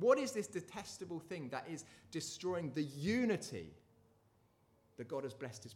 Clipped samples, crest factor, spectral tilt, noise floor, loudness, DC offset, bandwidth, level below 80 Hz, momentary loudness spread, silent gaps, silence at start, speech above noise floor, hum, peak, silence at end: under 0.1%; 22 dB; -5 dB/octave; -73 dBFS; -41 LUFS; under 0.1%; 16 kHz; -76 dBFS; 14 LU; none; 0 s; 33 dB; none; -18 dBFS; 0 s